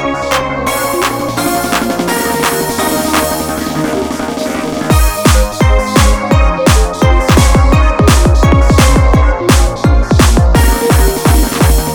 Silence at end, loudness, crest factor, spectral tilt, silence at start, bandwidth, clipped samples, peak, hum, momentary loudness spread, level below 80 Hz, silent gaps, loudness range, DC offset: 0 s; -11 LUFS; 10 dB; -5 dB/octave; 0 s; over 20 kHz; 0.2%; 0 dBFS; none; 7 LU; -14 dBFS; none; 4 LU; under 0.1%